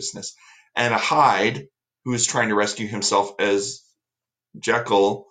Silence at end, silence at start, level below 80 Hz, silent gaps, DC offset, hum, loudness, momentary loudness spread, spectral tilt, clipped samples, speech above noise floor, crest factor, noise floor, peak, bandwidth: 0.1 s; 0 s; -64 dBFS; none; under 0.1%; none; -21 LUFS; 17 LU; -3 dB/octave; under 0.1%; 67 dB; 18 dB; -89 dBFS; -4 dBFS; 9.6 kHz